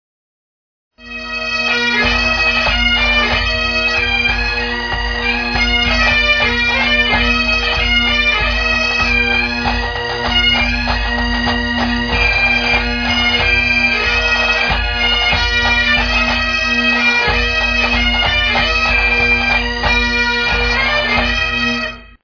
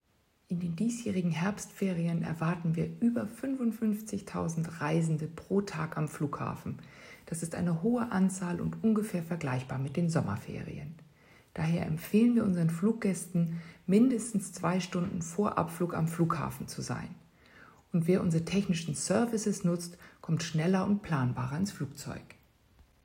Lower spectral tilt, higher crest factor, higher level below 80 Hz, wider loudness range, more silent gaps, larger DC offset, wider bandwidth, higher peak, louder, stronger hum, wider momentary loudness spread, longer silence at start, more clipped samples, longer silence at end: second, -3.5 dB/octave vs -6.5 dB/octave; about the same, 14 dB vs 18 dB; first, -24 dBFS vs -64 dBFS; about the same, 2 LU vs 4 LU; neither; neither; second, 5.4 kHz vs 16 kHz; first, -2 dBFS vs -12 dBFS; first, -13 LUFS vs -32 LUFS; neither; second, 5 LU vs 11 LU; first, 1 s vs 0.5 s; neither; second, 0.15 s vs 0.8 s